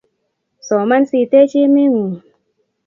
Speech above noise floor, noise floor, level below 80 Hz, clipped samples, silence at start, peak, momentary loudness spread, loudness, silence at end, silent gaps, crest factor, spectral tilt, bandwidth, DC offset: 57 dB; -70 dBFS; -68 dBFS; under 0.1%; 0.65 s; 0 dBFS; 10 LU; -13 LUFS; 0.7 s; none; 14 dB; -6.5 dB/octave; 7.4 kHz; under 0.1%